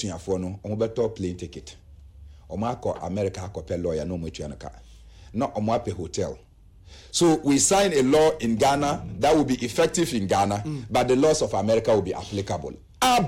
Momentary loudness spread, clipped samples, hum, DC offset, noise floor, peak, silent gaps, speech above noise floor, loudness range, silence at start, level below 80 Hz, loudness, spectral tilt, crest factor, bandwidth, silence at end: 15 LU; under 0.1%; none; under 0.1%; -46 dBFS; -10 dBFS; none; 22 dB; 10 LU; 0 s; -48 dBFS; -24 LUFS; -4.5 dB/octave; 14 dB; 16 kHz; 0 s